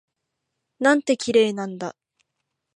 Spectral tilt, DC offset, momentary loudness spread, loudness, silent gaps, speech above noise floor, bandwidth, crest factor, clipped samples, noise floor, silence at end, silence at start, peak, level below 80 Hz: -4 dB/octave; under 0.1%; 14 LU; -21 LUFS; none; 59 dB; 11 kHz; 20 dB; under 0.1%; -80 dBFS; 0.85 s; 0.8 s; -4 dBFS; -72 dBFS